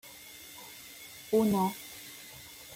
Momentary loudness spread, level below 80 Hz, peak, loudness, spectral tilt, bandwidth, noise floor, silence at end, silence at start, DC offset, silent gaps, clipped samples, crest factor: 19 LU; -68 dBFS; -16 dBFS; -30 LUFS; -5.5 dB/octave; 16.5 kHz; -50 dBFS; 0 s; 0.05 s; under 0.1%; none; under 0.1%; 18 dB